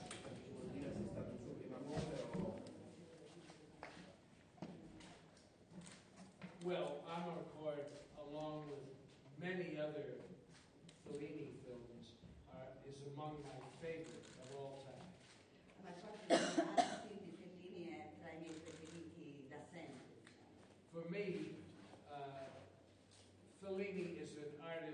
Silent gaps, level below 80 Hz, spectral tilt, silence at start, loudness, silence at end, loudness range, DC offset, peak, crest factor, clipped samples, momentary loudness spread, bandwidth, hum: none; -74 dBFS; -5 dB/octave; 0 s; -49 LUFS; 0 s; 11 LU; under 0.1%; -20 dBFS; 30 dB; under 0.1%; 18 LU; 9.6 kHz; none